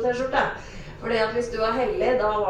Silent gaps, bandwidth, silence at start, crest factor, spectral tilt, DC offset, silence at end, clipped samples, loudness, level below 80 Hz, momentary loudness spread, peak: none; 10 kHz; 0 s; 18 dB; -5 dB/octave; under 0.1%; 0 s; under 0.1%; -24 LUFS; -42 dBFS; 12 LU; -6 dBFS